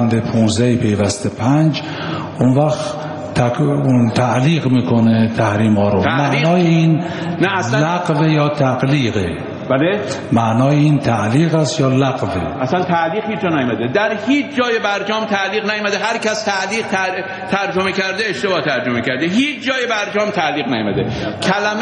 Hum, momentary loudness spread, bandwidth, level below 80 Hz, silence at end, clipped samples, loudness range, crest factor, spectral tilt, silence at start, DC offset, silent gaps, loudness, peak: none; 5 LU; 10.5 kHz; -48 dBFS; 0 s; under 0.1%; 3 LU; 14 dB; -6 dB/octave; 0 s; under 0.1%; none; -16 LUFS; 0 dBFS